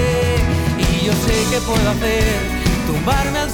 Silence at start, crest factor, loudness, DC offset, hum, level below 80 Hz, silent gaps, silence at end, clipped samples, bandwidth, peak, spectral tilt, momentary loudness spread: 0 s; 10 dB; -17 LUFS; under 0.1%; none; -24 dBFS; none; 0 s; under 0.1%; over 20 kHz; -6 dBFS; -5 dB/octave; 2 LU